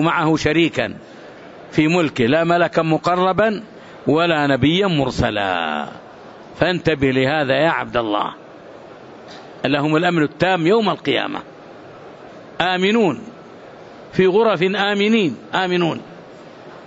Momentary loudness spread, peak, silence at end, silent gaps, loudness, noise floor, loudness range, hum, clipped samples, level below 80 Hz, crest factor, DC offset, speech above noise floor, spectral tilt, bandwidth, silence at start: 23 LU; 0 dBFS; 0 s; none; -18 LUFS; -39 dBFS; 3 LU; none; under 0.1%; -48 dBFS; 18 dB; under 0.1%; 22 dB; -6 dB/octave; 8 kHz; 0 s